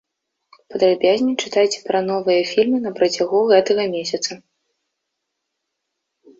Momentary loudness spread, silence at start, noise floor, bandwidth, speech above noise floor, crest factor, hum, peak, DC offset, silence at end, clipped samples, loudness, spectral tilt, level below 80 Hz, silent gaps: 9 LU; 0.7 s; -78 dBFS; 7.8 kHz; 60 dB; 18 dB; none; -2 dBFS; under 0.1%; 2 s; under 0.1%; -18 LUFS; -4 dB/octave; -66 dBFS; none